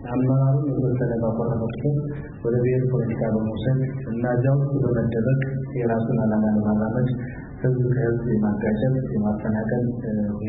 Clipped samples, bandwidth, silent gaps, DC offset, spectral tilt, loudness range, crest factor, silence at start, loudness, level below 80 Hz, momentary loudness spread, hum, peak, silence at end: under 0.1%; 4 kHz; none; under 0.1%; -14 dB/octave; 1 LU; 12 dB; 0 s; -23 LUFS; -44 dBFS; 5 LU; none; -10 dBFS; 0 s